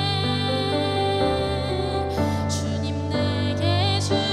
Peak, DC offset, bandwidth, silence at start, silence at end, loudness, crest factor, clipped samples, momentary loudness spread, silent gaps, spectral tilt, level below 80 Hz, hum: -10 dBFS; under 0.1%; 12.5 kHz; 0 s; 0 s; -23 LUFS; 12 dB; under 0.1%; 4 LU; none; -5.5 dB/octave; -44 dBFS; none